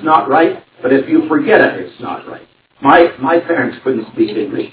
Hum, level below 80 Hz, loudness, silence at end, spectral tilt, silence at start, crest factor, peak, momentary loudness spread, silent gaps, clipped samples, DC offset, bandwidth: none; -54 dBFS; -13 LUFS; 0.05 s; -9.5 dB/octave; 0 s; 14 dB; 0 dBFS; 15 LU; none; 0.2%; under 0.1%; 4 kHz